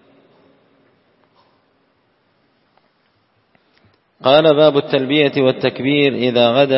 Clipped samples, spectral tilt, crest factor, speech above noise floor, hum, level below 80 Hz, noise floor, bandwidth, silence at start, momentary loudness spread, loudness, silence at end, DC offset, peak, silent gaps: under 0.1%; -8.5 dB/octave; 18 dB; 48 dB; none; -64 dBFS; -61 dBFS; 5.8 kHz; 4.25 s; 6 LU; -14 LUFS; 0 s; under 0.1%; 0 dBFS; none